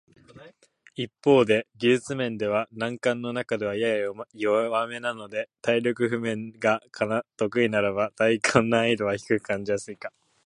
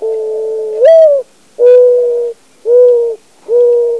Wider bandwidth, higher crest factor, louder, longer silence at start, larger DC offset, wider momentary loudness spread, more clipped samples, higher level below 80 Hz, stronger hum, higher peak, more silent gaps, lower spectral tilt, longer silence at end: first, 11.5 kHz vs 6.2 kHz; first, 24 dB vs 10 dB; second, -25 LUFS vs -9 LUFS; first, 0.35 s vs 0 s; second, under 0.1% vs 0.4%; about the same, 10 LU vs 12 LU; second, under 0.1% vs 0.9%; first, -64 dBFS vs -70 dBFS; neither; about the same, -2 dBFS vs 0 dBFS; neither; first, -5 dB/octave vs -3 dB/octave; first, 0.35 s vs 0 s